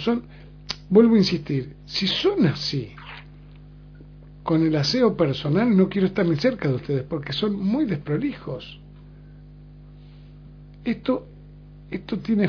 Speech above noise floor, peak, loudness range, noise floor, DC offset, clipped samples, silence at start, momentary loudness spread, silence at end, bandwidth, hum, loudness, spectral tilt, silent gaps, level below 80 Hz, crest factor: 22 dB; -4 dBFS; 11 LU; -44 dBFS; under 0.1%; under 0.1%; 0 s; 16 LU; 0 s; 5.4 kHz; 50 Hz at -45 dBFS; -22 LUFS; -7 dB/octave; none; -48 dBFS; 20 dB